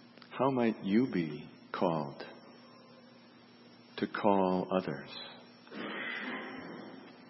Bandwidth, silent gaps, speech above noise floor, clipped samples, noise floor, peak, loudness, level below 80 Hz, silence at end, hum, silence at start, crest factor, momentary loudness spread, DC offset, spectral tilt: 6 kHz; none; 26 dB; under 0.1%; -58 dBFS; -12 dBFS; -34 LUFS; -78 dBFS; 0 s; none; 0 s; 24 dB; 19 LU; under 0.1%; -9.5 dB/octave